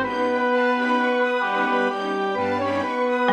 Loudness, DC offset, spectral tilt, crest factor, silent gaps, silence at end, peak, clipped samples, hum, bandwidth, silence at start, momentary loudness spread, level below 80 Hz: -22 LUFS; under 0.1%; -5 dB/octave; 14 dB; none; 0 s; -8 dBFS; under 0.1%; none; 10 kHz; 0 s; 3 LU; -64 dBFS